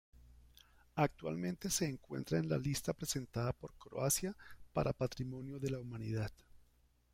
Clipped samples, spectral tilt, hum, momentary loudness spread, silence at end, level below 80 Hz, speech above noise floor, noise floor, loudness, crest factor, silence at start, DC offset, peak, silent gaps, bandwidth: under 0.1%; -5 dB/octave; 60 Hz at -60 dBFS; 9 LU; 0.5 s; -60 dBFS; 33 dB; -71 dBFS; -39 LUFS; 22 dB; 0.15 s; under 0.1%; -18 dBFS; none; 16 kHz